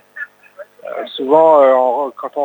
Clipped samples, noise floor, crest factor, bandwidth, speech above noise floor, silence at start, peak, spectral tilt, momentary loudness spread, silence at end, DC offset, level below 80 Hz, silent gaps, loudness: under 0.1%; -39 dBFS; 14 dB; 19 kHz; 27 dB; 0.15 s; 0 dBFS; -6 dB/octave; 21 LU; 0 s; under 0.1%; -74 dBFS; none; -12 LUFS